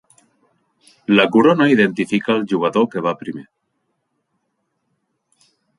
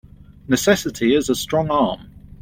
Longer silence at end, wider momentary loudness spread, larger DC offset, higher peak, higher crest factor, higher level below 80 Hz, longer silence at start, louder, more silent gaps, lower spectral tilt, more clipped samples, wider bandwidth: first, 2.35 s vs 0 s; first, 17 LU vs 5 LU; neither; about the same, -2 dBFS vs -2 dBFS; about the same, 18 dB vs 18 dB; second, -64 dBFS vs -44 dBFS; first, 1.1 s vs 0.5 s; first, -16 LUFS vs -19 LUFS; neither; first, -6.5 dB/octave vs -4.5 dB/octave; neither; second, 11.5 kHz vs 16.5 kHz